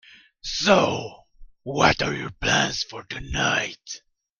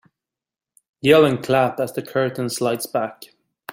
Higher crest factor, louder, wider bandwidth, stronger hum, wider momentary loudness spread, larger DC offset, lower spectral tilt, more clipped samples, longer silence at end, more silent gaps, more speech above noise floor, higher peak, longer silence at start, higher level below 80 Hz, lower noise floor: about the same, 22 dB vs 20 dB; second, -23 LUFS vs -20 LUFS; second, 10.5 kHz vs 16.5 kHz; neither; first, 18 LU vs 11 LU; neither; second, -3.5 dB/octave vs -5 dB/octave; neither; first, 0.45 s vs 0 s; neither; second, 24 dB vs 70 dB; about the same, -2 dBFS vs -2 dBFS; second, 0.45 s vs 1.05 s; first, -44 dBFS vs -60 dBFS; second, -47 dBFS vs -89 dBFS